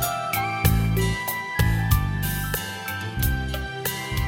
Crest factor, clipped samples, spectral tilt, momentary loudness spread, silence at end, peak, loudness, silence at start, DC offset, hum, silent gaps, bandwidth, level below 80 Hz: 20 dB; under 0.1%; -4.5 dB/octave; 7 LU; 0 s; -4 dBFS; -24 LUFS; 0 s; under 0.1%; none; none; 17 kHz; -30 dBFS